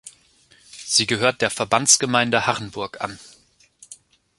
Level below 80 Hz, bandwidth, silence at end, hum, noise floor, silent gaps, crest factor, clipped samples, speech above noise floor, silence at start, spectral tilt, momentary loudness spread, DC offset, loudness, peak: -58 dBFS; 12 kHz; 0.45 s; none; -56 dBFS; none; 22 dB; under 0.1%; 36 dB; 0.05 s; -2 dB/octave; 16 LU; under 0.1%; -19 LUFS; -2 dBFS